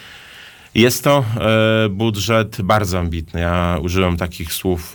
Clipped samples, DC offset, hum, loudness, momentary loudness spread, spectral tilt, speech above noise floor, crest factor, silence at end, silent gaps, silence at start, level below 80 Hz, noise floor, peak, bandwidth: under 0.1%; under 0.1%; none; -17 LUFS; 9 LU; -5.5 dB/octave; 24 dB; 16 dB; 0 s; none; 0 s; -34 dBFS; -41 dBFS; -2 dBFS; 19.5 kHz